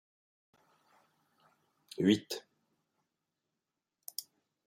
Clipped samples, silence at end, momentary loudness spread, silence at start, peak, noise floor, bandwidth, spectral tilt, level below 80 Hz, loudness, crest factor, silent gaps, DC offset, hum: under 0.1%; 0.45 s; 20 LU; 2 s; -14 dBFS; -89 dBFS; 16 kHz; -5 dB/octave; -80 dBFS; -34 LUFS; 26 dB; none; under 0.1%; none